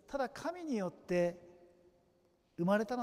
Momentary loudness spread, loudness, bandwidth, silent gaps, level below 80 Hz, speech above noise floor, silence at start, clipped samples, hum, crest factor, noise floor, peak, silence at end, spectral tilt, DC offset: 11 LU; -37 LUFS; 15 kHz; none; -70 dBFS; 37 dB; 0.1 s; under 0.1%; none; 18 dB; -73 dBFS; -20 dBFS; 0 s; -6.5 dB/octave; under 0.1%